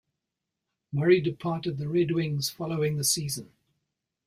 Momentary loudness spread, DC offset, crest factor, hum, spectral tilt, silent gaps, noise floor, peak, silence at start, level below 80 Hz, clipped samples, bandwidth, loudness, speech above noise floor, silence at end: 9 LU; under 0.1%; 20 dB; none; -5 dB/octave; none; -86 dBFS; -8 dBFS; 0.9 s; -64 dBFS; under 0.1%; 16 kHz; -27 LUFS; 59 dB; 0.8 s